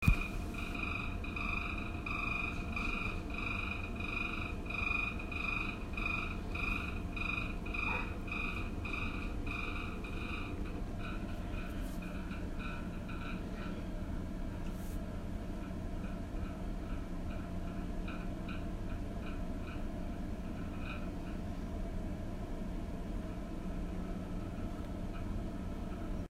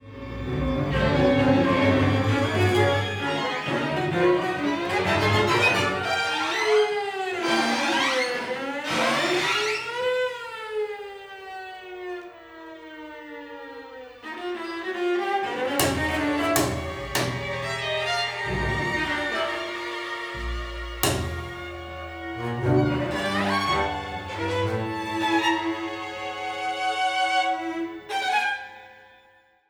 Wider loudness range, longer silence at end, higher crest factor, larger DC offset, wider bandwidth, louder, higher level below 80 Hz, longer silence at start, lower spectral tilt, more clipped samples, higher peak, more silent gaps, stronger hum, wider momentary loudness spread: second, 6 LU vs 9 LU; second, 0 s vs 0.65 s; about the same, 24 dB vs 22 dB; neither; second, 15.5 kHz vs over 20 kHz; second, -40 LUFS vs -25 LUFS; about the same, -42 dBFS vs -44 dBFS; about the same, 0 s vs 0 s; first, -6.5 dB/octave vs -4.5 dB/octave; neither; second, -14 dBFS vs -4 dBFS; neither; neither; second, 7 LU vs 16 LU